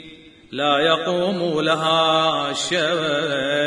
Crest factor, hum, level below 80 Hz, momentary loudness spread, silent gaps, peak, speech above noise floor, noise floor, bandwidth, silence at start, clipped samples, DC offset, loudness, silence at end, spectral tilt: 16 dB; none; -60 dBFS; 5 LU; none; -4 dBFS; 24 dB; -44 dBFS; 10.5 kHz; 0 s; under 0.1%; under 0.1%; -19 LUFS; 0 s; -3.5 dB/octave